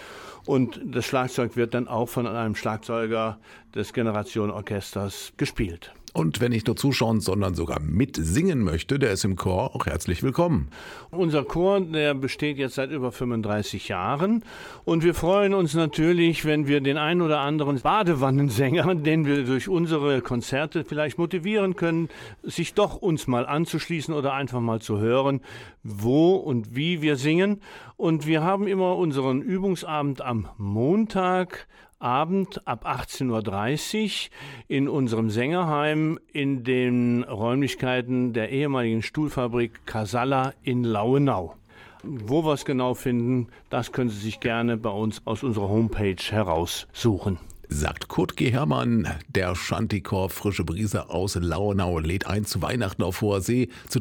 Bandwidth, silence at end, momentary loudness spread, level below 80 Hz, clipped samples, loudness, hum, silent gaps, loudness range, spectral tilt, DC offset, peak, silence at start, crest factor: 19 kHz; 0 s; 8 LU; -46 dBFS; under 0.1%; -25 LUFS; none; none; 4 LU; -6 dB/octave; under 0.1%; -6 dBFS; 0 s; 18 dB